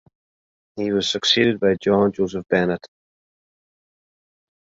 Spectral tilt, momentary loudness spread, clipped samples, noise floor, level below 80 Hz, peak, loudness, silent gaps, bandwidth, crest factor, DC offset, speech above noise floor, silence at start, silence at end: -4.5 dB/octave; 11 LU; under 0.1%; under -90 dBFS; -56 dBFS; -4 dBFS; -20 LUFS; none; 7.8 kHz; 20 dB; under 0.1%; over 70 dB; 0.75 s; 1.8 s